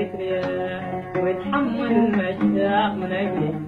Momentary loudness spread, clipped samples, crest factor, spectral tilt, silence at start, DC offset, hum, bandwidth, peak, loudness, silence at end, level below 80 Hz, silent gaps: 7 LU; under 0.1%; 16 dB; -8.5 dB/octave; 0 s; under 0.1%; none; 5.4 kHz; -6 dBFS; -23 LUFS; 0 s; -54 dBFS; none